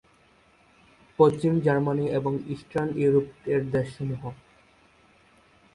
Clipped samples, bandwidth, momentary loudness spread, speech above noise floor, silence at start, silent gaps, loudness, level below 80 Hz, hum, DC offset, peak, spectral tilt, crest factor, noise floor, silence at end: under 0.1%; 11 kHz; 11 LU; 35 dB; 1.2 s; none; -25 LUFS; -58 dBFS; none; under 0.1%; -6 dBFS; -8.5 dB/octave; 22 dB; -60 dBFS; 1.4 s